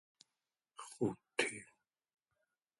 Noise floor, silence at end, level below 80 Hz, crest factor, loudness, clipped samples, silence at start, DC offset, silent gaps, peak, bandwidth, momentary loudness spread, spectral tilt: under -90 dBFS; 1.15 s; -82 dBFS; 30 dB; -39 LUFS; under 0.1%; 0.8 s; under 0.1%; none; -16 dBFS; 11.5 kHz; 17 LU; -3.5 dB/octave